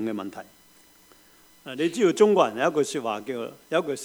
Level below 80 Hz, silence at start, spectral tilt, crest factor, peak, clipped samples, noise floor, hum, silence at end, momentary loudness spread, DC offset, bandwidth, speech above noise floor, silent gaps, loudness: -72 dBFS; 0 s; -4.5 dB/octave; 20 dB; -6 dBFS; under 0.1%; -56 dBFS; none; 0 s; 19 LU; under 0.1%; over 20 kHz; 31 dB; none; -24 LUFS